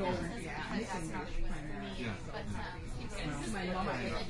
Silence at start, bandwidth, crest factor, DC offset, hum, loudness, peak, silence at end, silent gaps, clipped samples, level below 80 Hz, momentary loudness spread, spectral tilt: 0 s; 11.5 kHz; 14 dB; under 0.1%; none; -40 LUFS; -22 dBFS; 0 s; none; under 0.1%; -44 dBFS; 6 LU; -5 dB/octave